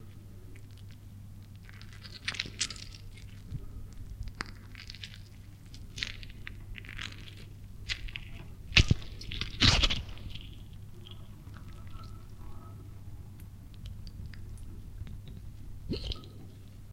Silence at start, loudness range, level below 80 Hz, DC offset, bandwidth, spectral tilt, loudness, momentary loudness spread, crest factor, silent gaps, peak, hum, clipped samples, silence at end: 0 s; 18 LU; -42 dBFS; under 0.1%; 16 kHz; -3.5 dB/octave; -33 LUFS; 22 LU; 36 dB; none; -2 dBFS; none; under 0.1%; 0 s